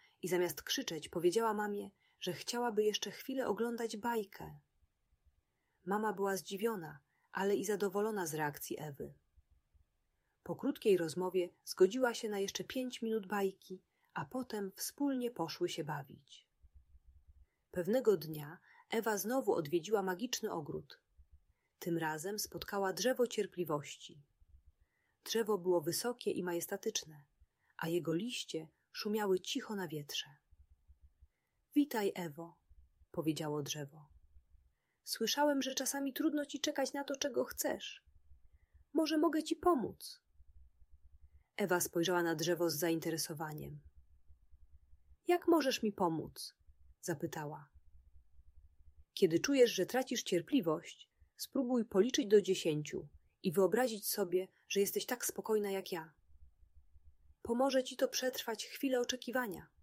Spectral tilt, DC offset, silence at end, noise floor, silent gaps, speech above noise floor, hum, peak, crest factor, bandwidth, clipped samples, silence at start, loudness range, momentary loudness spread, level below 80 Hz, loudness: -4 dB/octave; under 0.1%; 0.15 s; -81 dBFS; none; 45 dB; none; -18 dBFS; 20 dB; 16 kHz; under 0.1%; 0.25 s; 6 LU; 15 LU; -70 dBFS; -37 LUFS